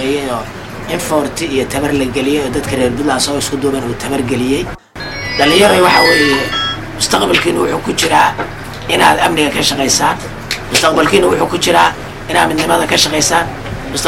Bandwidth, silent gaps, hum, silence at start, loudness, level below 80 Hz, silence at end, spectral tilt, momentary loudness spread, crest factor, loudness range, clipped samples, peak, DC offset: 16.5 kHz; none; none; 0 s; -12 LUFS; -34 dBFS; 0 s; -3 dB/octave; 13 LU; 14 dB; 4 LU; under 0.1%; 0 dBFS; under 0.1%